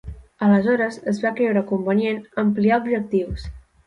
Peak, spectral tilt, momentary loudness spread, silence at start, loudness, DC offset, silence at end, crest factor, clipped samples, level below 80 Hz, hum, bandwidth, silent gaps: -6 dBFS; -8 dB/octave; 10 LU; 0.05 s; -21 LUFS; under 0.1%; 0.3 s; 14 dB; under 0.1%; -42 dBFS; none; 9.2 kHz; none